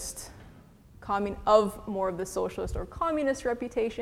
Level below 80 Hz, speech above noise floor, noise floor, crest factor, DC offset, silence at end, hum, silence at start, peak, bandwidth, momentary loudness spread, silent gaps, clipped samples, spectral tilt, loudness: -46 dBFS; 25 dB; -53 dBFS; 22 dB; under 0.1%; 0 s; none; 0 s; -8 dBFS; 16.5 kHz; 14 LU; none; under 0.1%; -5 dB/octave; -29 LUFS